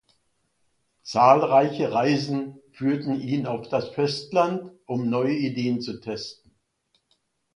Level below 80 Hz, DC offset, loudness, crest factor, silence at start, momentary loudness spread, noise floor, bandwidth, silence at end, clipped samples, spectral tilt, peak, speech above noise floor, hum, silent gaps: -66 dBFS; under 0.1%; -24 LUFS; 22 dB; 1.05 s; 15 LU; -71 dBFS; 11 kHz; 1.2 s; under 0.1%; -6.5 dB/octave; -2 dBFS; 48 dB; none; none